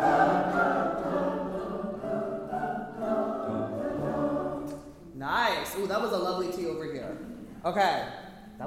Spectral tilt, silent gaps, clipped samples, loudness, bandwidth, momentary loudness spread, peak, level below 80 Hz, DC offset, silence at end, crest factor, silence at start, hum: -5.5 dB/octave; none; under 0.1%; -30 LUFS; 16.5 kHz; 13 LU; -12 dBFS; -56 dBFS; under 0.1%; 0 s; 18 dB; 0 s; none